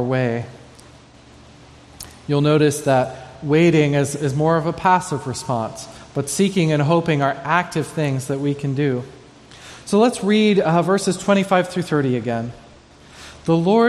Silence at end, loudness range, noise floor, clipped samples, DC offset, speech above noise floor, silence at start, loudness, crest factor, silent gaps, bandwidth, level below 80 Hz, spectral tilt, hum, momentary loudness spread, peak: 0 s; 3 LU; -46 dBFS; under 0.1%; under 0.1%; 28 dB; 0 s; -19 LUFS; 18 dB; none; 13.5 kHz; -54 dBFS; -6 dB/octave; none; 15 LU; -2 dBFS